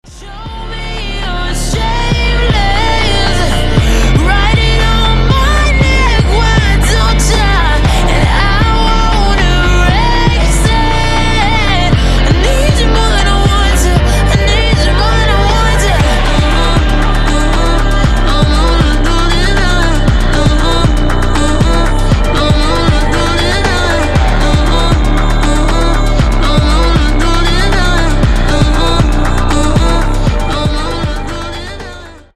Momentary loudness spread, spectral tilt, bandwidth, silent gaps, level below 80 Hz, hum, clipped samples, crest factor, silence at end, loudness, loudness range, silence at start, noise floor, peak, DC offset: 4 LU; -5 dB/octave; 13 kHz; none; -12 dBFS; none; under 0.1%; 8 dB; 0.15 s; -11 LUFS; 2 LU; 0.1 s; -29 dBFS; 0 dBFS; under 0.1%